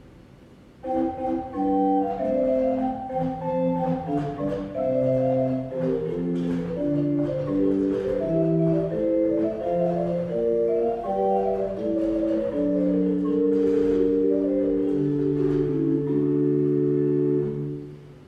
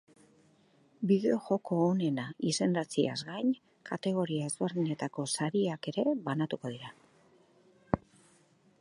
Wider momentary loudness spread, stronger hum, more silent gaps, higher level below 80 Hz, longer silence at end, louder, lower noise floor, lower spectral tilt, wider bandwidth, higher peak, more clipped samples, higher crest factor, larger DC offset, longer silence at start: about the same, 6 LU vs 8 LU; neither; neither; first, -50 dBFS vs -66 dBFS; second, 0.05 s vs 0.85 s; first, -24 LUFS vs -32 LUFS; second, -49 dBFS vs -66 dBFS; first, -10.5 dB/octave vs -5.5 dB/octave; second, 6 kHz vs 11.5 kHz; about the same, -10 dBFS vs -8 dBFS; neither; second, 12 dB vs 24 dB; neither; second, 0.05 s vs 1 s